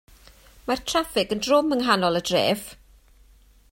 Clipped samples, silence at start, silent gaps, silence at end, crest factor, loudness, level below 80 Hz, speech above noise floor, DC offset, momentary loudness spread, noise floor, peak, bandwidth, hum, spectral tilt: under 0.1%; 0.65 s; none; 0.95 s; 22 dB; -23 LUFS; -52 dBFS; 32 dB; under 0.1%; 9 LU; -54 dBFS; -4 dBFS; 16.5 kHz; none; -4 dB/octave